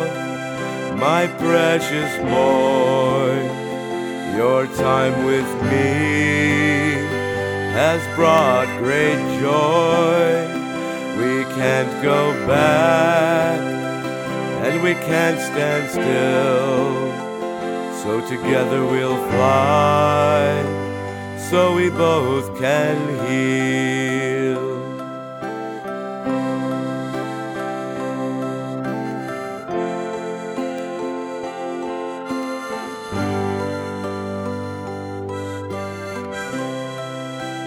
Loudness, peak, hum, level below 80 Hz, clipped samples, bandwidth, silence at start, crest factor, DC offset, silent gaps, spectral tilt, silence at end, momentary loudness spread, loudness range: -20 LUFS; 0 dBFS; none; -56 dBFS; under 0.1%; 17.5 kHz; 0 s; 20 dB; under 0.1%; none; -5.5 dB/octave; 0 s; 12 LU; 9 LU